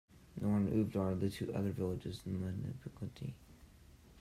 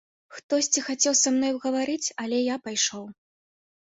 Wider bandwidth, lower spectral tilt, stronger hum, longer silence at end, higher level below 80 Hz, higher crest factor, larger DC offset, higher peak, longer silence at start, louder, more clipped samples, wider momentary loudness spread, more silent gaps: first, 14.5 kHz vs 8.2 kHz; first, -8 dB/octave vs -1 dB/octave; neither; second, 0 s vs 0.75 s; first, -62 dBFS vs -72 dBFS; about the same, 16 dB vs 20 dB; neither; second, -22 dBFS vs -6 dBFS; second, 0.15 s vs 0.3 s; second, -39 LUFS vs -24 LUFS; neither; first, 14 LU vs 8 LU; second, none vs 0.43-0.49 s